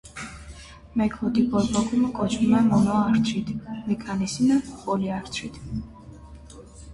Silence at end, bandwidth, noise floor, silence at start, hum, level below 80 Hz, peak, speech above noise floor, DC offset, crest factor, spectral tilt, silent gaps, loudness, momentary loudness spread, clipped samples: 0 s; 11.5 kHz; -44 dBFS; 0.05 s; none; -46 dBFS; -8 dBFS; 21 dB; under 0.1%; 16 dB; -6 dB/octave; none; -24 LUFS; 22 LU; under 0.1%